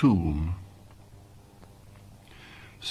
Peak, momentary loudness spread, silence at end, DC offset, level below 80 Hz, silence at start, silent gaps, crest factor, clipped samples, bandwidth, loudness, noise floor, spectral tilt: -10 dBFS; 25 LU; 0 s; under 0.1%; -42 dBFS; 0 s; none; 20 dB; under 0.1%; 12.5 kHz; -29 LUFS; -51 dBFS; -7.5 dB/octave